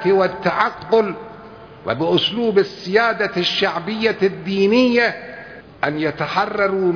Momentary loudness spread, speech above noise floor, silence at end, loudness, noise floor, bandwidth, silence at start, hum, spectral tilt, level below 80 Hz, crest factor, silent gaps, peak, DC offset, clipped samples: 16 LU; 21 dB; 0 s; -18 LUFS; -39 dBFS; 5.4 kHz; 0 s; none; -6 dB/octave; -56 dBFS; 18 dB; none; -2 dBFS; under 0.1%; under 0.1%